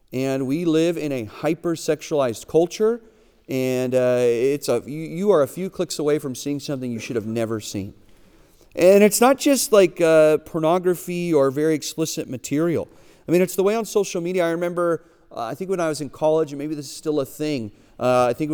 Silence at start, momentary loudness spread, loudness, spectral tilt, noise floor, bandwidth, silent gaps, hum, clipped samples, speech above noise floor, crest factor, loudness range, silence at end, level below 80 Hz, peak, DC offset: 0.1 s; 13 LU; -21 LUFS; -5 dB/octave; -52 dBFS; over 20 kHz; none; none; under 0.1%; 31 dB; 20 dB; 7 LU; 0 s; -58 dBFS; -2 dBFS; under 0.1%